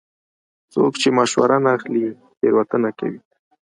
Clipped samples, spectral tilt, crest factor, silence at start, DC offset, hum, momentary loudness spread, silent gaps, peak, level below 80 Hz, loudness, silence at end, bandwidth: under 0.1%; -4.5 dB/octave; 18 dB; 0.75 s; under 0.1%; none; 12 LU; 2.37-2.41 s; -2 dBFS; -68 dBFS; -19 LUFS; 0.45 s; 11 kHz